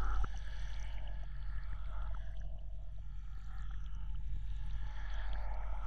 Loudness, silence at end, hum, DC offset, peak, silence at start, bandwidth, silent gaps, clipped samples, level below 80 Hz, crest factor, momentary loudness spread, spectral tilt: -46 LUFS; 0 s; none; under 0.1%; -22 dBFS; 0 s; 6.4 kHz; none; under 0.1%; -42 dBFS; 14 dB; 6 LU; -6 dB/octave